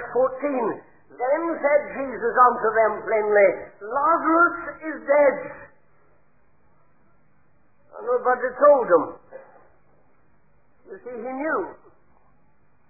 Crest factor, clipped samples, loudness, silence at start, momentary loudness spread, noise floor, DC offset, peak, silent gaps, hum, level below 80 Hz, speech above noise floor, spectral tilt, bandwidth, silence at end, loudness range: 18 dB; under 0.1%; -21 LUFS; 0 s; 18 LU; -64 dBFS; 0.2%; -4 dBFS; none; none; -66 dBFS; 43 dB; -12 dB/octave; 2.6 kHz; 1.15 s; 12 LU